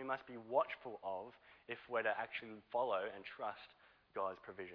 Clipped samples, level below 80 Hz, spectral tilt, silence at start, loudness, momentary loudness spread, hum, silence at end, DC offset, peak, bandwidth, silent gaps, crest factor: under 0.1%; -82 dBFS; -1.5 dB/octave; 0 s; -43 LUFS; 12 LU; none; 0 s; under 0.1%; -22 dBFS; 5.4 kHz; none; 22 dB